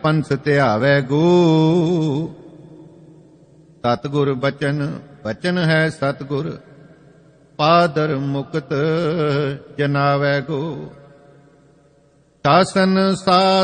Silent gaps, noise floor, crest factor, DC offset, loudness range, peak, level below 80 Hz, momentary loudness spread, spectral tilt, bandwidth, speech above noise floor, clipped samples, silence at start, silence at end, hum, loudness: none; -55 dBFS; 18 dB; under 0.1%; 5 LU; -2 dBFS; -56 dBFS; 11 LU; -6.5 dB/octave; 9.8 kHz; 38 dB; under 0.1%; 0 s; 0 s; none; -18 LUFS